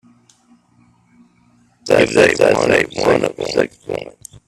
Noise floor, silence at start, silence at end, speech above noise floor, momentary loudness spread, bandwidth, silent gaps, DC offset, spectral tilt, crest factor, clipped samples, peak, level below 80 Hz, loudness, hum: -54 dBFS; 1.85 s; 0.35 s; 40 dB; 16 LU; 13.5 kHz; none; under 0.1%; -4.5 dB/octave; 18 dB; under 0.1%; 0 dBFS; -48 dBFS; -15 LUFS; 60 Hz at -45 dBFS